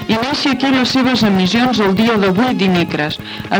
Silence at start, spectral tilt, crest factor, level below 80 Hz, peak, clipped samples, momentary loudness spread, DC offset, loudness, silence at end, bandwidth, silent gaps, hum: 0 s; -5.5 dB/octave; 12 dB; -46 dBFS; 0 dBFS; under 0.1%; 5 LU; under 0.1%; -14 LUFS; 0 s; 17 kHz; none; none